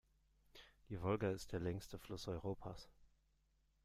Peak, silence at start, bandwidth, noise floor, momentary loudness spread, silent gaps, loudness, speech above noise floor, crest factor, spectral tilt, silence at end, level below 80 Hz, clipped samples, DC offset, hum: -26 dBFS; 0.55 s; 15.5 kHz; -79 dBFS; 23 LU; none; -46 LUFS; 34 dB; 20 dB; -6.5 dB/octave; 0.8 s; -64 dBFS; under 0.1%; under 0.1%; none